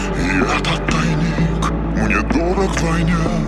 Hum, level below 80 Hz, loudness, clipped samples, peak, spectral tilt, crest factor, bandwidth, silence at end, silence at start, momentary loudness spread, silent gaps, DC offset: none; -24 dBFS; -17 LUFS; under 0.1%; -2 dBFS; -6 dB/octave; 14 dB; 11.5 kHz; 0 s; 0 s; 2 LU; none; under 0.1%